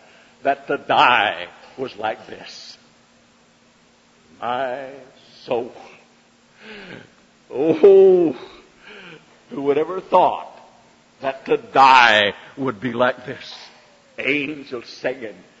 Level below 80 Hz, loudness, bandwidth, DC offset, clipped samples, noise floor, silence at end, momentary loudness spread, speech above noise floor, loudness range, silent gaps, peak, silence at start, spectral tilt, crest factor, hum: -64 dBFS; -18 LUFS; 7.8 kHz; under 0.1%; under 0.1%; -55 dBFS; 0.3 s; 26 LU; 36 dB; 14 LU; none; 0 dBFS; 0.45 s; -4.5 dB/octave; 20 dB; none